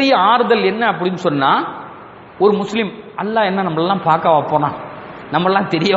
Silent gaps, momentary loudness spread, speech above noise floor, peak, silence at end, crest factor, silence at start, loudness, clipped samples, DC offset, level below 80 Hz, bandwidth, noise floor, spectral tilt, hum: none; 13 LU; 22 dB; 0 dBFS; 0 s; 16 dB; 0 s; -16 LUFS; under 0.1%; under 0.1%; -58 dBFS; 8 kHz; -37 dBFS; -6.5 dB/octave; none